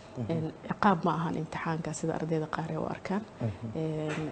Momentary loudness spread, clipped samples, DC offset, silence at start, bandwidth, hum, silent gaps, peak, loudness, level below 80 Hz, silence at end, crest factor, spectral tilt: 8 LU; under 0.1%; under 0.1%; 0 s; 9.2 kHz; none; none; -10 dBFS; -32 LUFS; -60 dBFS; 0 s; 22 dB; -6.5 dB/octave